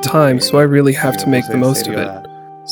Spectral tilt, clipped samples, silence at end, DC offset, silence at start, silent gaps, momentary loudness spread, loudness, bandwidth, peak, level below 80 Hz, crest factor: -5.5 dB/octave; under 0.1%; 0 s; under 0.1%; 0 s; none; 13 LU; -13 LUFS; 19.5 kHz; 0 dBFS; -56 dBFS; 14 dB